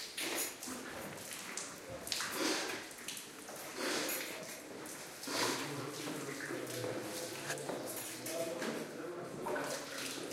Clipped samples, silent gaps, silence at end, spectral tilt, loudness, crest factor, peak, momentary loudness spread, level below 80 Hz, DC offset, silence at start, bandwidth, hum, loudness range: under 0.1%; none; 0 s; -2 dB/octave; -40 LUFS; 28 dB; -14 dBFS; 10 LU; -76 dBFS; under 0.1%; 0 s; 16.5 kHz; none; 2 LU